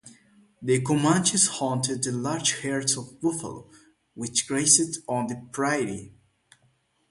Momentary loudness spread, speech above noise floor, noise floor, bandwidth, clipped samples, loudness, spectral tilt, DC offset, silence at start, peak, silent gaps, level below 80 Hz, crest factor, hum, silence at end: 14 LU; 41 dB; -67 dBFS; 11.5 kHz; under 0.1%; -24 LUFS; -3 dB/octave; under 0.1%; 0.05 s; -4 dBFS; none; -64 dBFS; 22 dB; none; 1 s